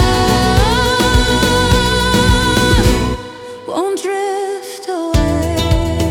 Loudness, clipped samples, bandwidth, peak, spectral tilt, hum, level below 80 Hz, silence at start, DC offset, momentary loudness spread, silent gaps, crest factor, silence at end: -14 LUFS; under 0.1%; 18 kHz; 0 dBFS; -4.5 dB/octave; none; -20 dBFS; 0 s; under 0.1%; 11 LU; none; 12 dB; 0 s